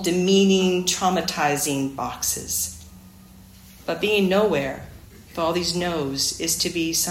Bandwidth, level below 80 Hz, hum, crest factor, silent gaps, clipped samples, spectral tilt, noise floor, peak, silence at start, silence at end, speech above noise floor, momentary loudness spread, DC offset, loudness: 16.5 kHz; -50 dBFS; none; 16 dB; none; under 0.1%; -3.5 dB/octave; -46 dBFS; -6 dBFS; 0 s; 0 s; 24 dB; 11 LU; under 0.1%; -22 LUFS